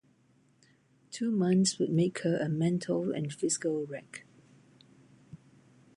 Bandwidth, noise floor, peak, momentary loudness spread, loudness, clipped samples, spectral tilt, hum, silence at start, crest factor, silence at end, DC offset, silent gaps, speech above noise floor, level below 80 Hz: 11.5 kHz; -67 dBFS; -14 dBFS; 16 LU; -30 LUFS; under 0.1%; -5.5 dB/octave; none; 1.1 s; 18 dB; 0.6 s; under 0.1%; none; 37 dB; -74 dBFS